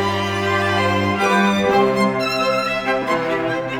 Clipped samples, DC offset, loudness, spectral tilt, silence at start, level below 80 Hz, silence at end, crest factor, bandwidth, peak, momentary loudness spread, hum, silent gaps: under 0.1%; under 0.1%; -18 LUFS; -5 dB/octave; 0 s; -50 dBFS; 0 s; 14 dB; 18.5 kHz; -4 dBFS; 4 LU; none; none